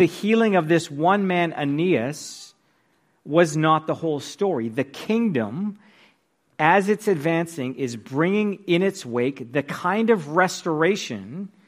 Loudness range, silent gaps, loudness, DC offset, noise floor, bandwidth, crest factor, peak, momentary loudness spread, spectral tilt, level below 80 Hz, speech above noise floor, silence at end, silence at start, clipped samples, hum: 2 LU; none; -22 LUFS; under 0.1%; -65 dBFS; 15.5 kHz; 18 dB; -4 dBFS; 10 LU; -6 dB/octave; -70 dBFS; 43 dB; 0.2 s; 0 s; under 0.1%; none